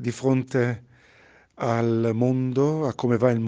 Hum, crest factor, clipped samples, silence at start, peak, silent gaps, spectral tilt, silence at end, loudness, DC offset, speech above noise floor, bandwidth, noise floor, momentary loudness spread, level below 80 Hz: none; 18 dB; under 0.1%; 0 s; -6 dBFS; none; -8 dB/octave; 0 s; -24 LUFS; under 0.1%; 33 dB; 9.2 kHz; -55 dBFS; 5 LU; -62 dBFS